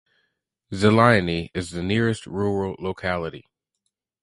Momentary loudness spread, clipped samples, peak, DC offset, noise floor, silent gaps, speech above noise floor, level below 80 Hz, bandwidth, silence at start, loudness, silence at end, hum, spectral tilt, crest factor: 13 LU; under 0.1%; 0 dBFS; under 0.1%; -79 dBFS; none; 57 dB; -46 dBFS; 11.5 kHz; 0.7 s; -22 LUFS; 0.85 s; none; -6.5 dB/octave; 22 dB